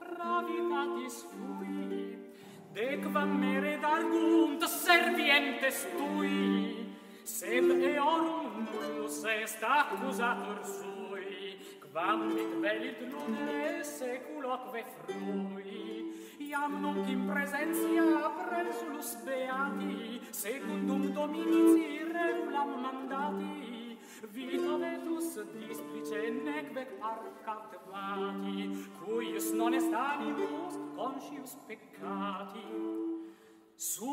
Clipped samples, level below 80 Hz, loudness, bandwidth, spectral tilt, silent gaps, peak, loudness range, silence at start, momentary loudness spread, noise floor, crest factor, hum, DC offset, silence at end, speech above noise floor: under 0.1%; -86 dBFS; -33 LUFS; 16 kHz; -4 dB/octave; none; -10 dBFS; 10 LU; 0 s; 15 LU; -58 dBFS; 24 dB; none; under 0.1%; 0 s; 25 dB